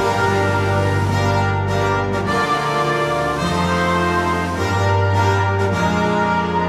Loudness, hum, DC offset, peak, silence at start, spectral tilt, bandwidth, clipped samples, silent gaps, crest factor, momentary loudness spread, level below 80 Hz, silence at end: -18 LUFS; none; under 0.1%; -6 dBFS; 0 s; -6 dB/octave; 14 kHz; under 0.1%; none; 12 dB; 2 LU; -40 dBFS; 0 s